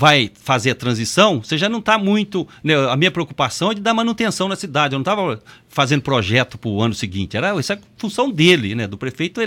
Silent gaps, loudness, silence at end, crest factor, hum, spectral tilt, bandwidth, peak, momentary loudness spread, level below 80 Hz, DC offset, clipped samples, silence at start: none; -18 LUFS; 0 s; 18 dB; none; -4.5 dB/octave; 17 kHz; 0 dBFS; 9 LU; -54 dBFS; under 0.1%; under 0.1%; 0 s